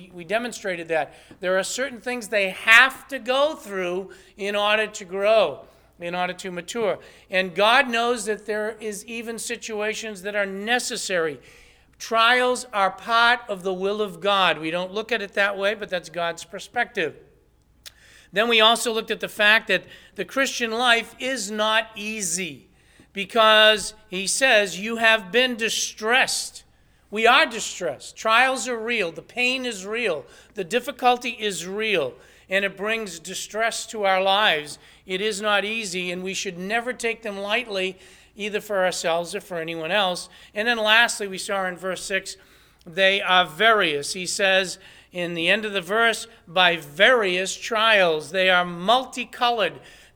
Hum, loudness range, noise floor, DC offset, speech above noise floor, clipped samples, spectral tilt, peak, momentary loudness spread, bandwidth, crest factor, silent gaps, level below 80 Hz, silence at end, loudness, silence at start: none; 6 LU; -59 dBFS; under 0.1%; 36 dB; under 0.1%; -2 dB/octave; 0 dBFS; 13 LU; over 20 kHz; 24 dB; none; -60 dBFS; 0.25 s; -22 LUFS; 0 s